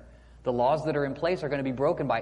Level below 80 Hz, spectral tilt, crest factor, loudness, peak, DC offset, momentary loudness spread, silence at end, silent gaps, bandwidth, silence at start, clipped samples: -54 dBFS; -7.5 dB/octave; 14 dB; -28 LUFS; -12 dBFS; under 0.1%; 5 LU; 0 s; none; 11 kHz; 0 s; under 0.1%